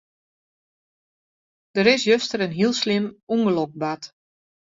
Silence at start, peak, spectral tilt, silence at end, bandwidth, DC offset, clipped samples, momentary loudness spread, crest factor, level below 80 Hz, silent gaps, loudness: 1.75 s; -2 dBFS; -4.5 dB/octave; 0.7 s; 7.8 kHz; under 0.1%; under 0.1%; 11 LU; 22 dB; -66 dBFS; 3.23-3.27 s; -21 LUFS